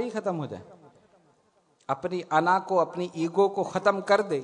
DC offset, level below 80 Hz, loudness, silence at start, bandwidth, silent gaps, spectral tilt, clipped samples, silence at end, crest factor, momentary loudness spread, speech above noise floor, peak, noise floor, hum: under 0.1%; -76 dBFS; -26 LUFS; 0 s; 10.5 kHz; none; -6 dB/octave; under 0.1%; 0 s; 20 dB; 11 LU; 40 dB; -8 dBFS; -66 dBFS; none